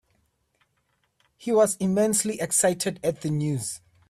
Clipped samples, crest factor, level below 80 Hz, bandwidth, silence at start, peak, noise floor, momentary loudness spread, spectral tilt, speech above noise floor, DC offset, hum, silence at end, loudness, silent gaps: under 0.1%; 16 dB; -62 dBFS; 15.5 kHz; 1.4 s; -10 dBFS; -72 dBFS; 8 LU; -4.5 dB/octave; 48 dB; under 0.1%; none; 0.3 s; -24 LUFS; none